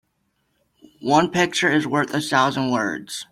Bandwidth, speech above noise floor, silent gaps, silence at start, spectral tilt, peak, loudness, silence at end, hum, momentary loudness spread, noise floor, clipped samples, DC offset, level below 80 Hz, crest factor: 15.5 kHz; 50 dB; none; 1 s; -4 dB/octave; -4 dBFS; -20 LUFS; 0.05 s; none; 7 LU; -70 dBFS; under 0.1%; under 0.1%; -60 dBFS; 18 dB